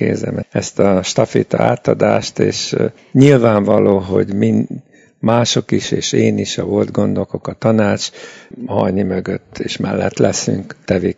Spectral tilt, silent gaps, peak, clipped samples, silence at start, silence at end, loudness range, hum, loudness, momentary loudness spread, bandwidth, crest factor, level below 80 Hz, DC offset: -5.5 dB/octave; none; 0 dBFS; 0.2%; 0 s; 0.05 s; 5 LU; none; -15 LUFS; 10 LU; 8 kHz; 16 dB; -52 dBFS; under 0.1%